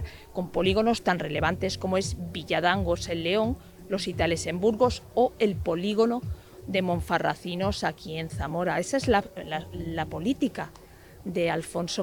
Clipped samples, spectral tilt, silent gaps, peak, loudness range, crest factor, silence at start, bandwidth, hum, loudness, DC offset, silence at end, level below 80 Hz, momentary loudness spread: under 0.1%; -5 dB/octave; none; -8 dBFS; 3 LU; 20 dB; 0 s; 19.5 kHz; none; -27 LUFS; under 0.1%; 0 s; -46 dBFS; 10 LU